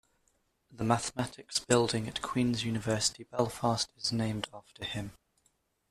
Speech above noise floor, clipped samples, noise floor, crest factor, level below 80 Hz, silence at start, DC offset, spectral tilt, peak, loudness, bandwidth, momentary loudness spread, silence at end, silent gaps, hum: 42 dB; under 0.1%; -74 dBFS; 22 dB; -60 dBFS; 0.7 s; under 0.1%; -4 dB/octave; -10 dBFS; -32 LUFS; 14.5 kHz; 11 LU; 0.8 s; none; none